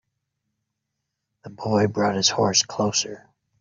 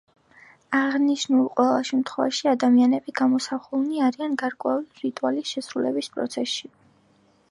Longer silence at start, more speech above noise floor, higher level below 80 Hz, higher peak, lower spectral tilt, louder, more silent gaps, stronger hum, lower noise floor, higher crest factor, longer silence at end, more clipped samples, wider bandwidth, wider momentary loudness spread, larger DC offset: first, 1.45 s vs 0.7 s; first, 58 dB vs 38 dB; first, -64 dBFS vs -76 dBFS; about the same, -4 dBFS vs -6 dBFS; about the same, -3 dB/octave vs -3.5 dB/octave; first, -21 LUFS vs -24 LUFS; neither; neither; first, -81 dBFS vs -61 dBFS; about the same, 22 dB vs 18 dB; second, 0.4 s vs 0.85 s; neither; second, 7.6 kHz vs 11.5 kHz; about the same, 8 LU vs 9 LU; neither